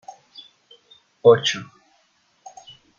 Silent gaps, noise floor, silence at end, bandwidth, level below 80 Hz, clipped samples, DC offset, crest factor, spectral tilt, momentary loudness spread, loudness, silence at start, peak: none; -63 dBFS; 1.35 s; 7.4 kHz; -68 dBFS; under 0.1%; under 0.1%; 22 dB; -4 dB/octave; 27 LU; -18 LUFS; 1.25 s; -2 dBFS